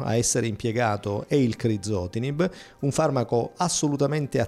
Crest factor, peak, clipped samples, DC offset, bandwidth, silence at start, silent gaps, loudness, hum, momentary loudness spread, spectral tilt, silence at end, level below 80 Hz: 14 dB; -10 dBFS; under 0.1%; under 0.1%; 14.5 kHz; 0 s; none; -25 LUFS; none; 5 LU; -5 dB/octave; 0 s; -54 dBFS